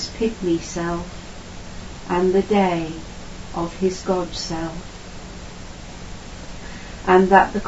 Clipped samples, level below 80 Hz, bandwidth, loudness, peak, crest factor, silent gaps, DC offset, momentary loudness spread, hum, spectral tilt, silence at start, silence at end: under 0.1%; -40 dBFS; 8 kHz; -21 LUFS; 0 dBFS; 22 dB; none; under 0.1%; 20 LU; none; -5.5 dB/octave; 0 s; 0 s